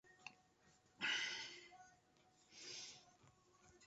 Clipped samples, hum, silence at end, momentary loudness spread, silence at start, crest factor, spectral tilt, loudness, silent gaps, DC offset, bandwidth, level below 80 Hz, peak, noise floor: under 0.1%; none; 0 s; 22 LU; 0.05 s; 24 dB; 2 dB/octave; -46 LUFS; none; under 0.1%; 8 kHz; -88 dBFS; -30 dBFS; -74 dBFS